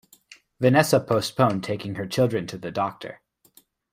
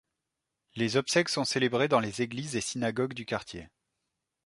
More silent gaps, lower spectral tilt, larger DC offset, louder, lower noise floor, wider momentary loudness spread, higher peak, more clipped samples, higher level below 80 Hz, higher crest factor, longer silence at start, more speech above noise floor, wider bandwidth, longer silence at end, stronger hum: neither; first, -5.5 dB/octave vs -4 dB/octave; neither; first, -23 LUFS vs -29 LUFS; second, -59 dBFS vs -86 dBFS; about the same, 11 LU vs 10 LU; first, -4 dBFS vs -10 dBFS; neither; about the same, -60 dBFS vs -64 dBFS; about the same, 20 dB vs 22 dB; second, 0.6 s vs 0.75 s; second, 36 dB vs 56 dB; first, 16 kHz vs 11.5 kHz; about the same, 0.75 s vs 0.8 s; neither